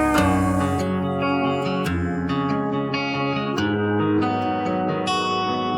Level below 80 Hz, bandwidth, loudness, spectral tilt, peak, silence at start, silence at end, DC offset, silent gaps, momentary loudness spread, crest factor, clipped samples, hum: -46 dBFS; 17 kHz; -22 LUFS; -6 dB/octave; -6 dBFS; 0 s; 0 s; under 0.1%; none; 4 LU; 16 dB; under 0.1%; none